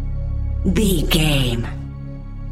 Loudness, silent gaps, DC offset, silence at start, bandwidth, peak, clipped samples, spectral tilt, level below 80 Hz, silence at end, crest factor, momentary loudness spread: -20 LUFS; none; under 0.1%; 0 s; 16.5 kHz; -4 dBFS; under 0.1%; -5 dB/octave; -24 dBFS; 0 s; 16 dB; 16 LU